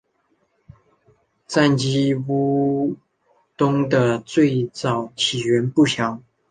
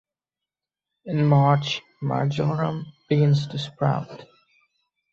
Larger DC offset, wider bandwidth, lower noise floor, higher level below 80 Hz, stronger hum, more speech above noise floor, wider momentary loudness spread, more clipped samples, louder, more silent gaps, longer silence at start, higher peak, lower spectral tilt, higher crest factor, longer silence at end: neither; first, 9.6 kHz vs 7.2 kHz; second, -66 dBFS vs -89 dBFS; about the same, -58 dBFS vs -62 dBFS; neither; second, 47 dB vs 67 dB; second, 6 LU vs 12 LU; neither; first, -20 LUFS vs -23 LUFS; neither; first, 1.5 s vs 1.05 s; first, -2 dBFS vs -6 dBFS; second, -5.5 dB/octave vs -7.5 dB/octave; about the same, 18 dB vs 18 dB; second, 0.3 s vs 0.9 s